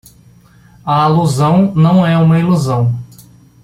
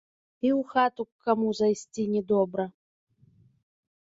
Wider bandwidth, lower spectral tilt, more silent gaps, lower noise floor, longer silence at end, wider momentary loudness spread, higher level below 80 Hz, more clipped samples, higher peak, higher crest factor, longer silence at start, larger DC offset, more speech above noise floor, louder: first, 14 kHz vs 8 kHz; first, -7.5 dB/octave vs -6 dB/octave; second, none vs 1.12-1.19 s; second, -44 dBFS vs -61 dBFS; second, 0.6 s vs 1.35 s; about the same, 7 LU vs 7 LU; first, -46 dBFS vs -70 dBFS; neither; first, -2 dBFS vs -10 dBFS; second, 12 dB vs 20 dB; first, 0.85 s vs 0.45 s; neither; about the same, 33 dB vs 35 dB; first, -12 LUFS vs -27 LUFS